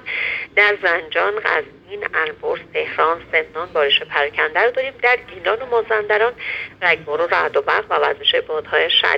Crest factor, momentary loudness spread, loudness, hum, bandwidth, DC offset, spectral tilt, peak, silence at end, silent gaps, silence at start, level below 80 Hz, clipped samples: 18 dB; 8 LU; -18 LUFS; none; 7.6 kHz; under 0.1%; -3.5 dB/octave; 0 dBFS; 0 s; none; 0.05 s; -56 dBFS; under 0.1%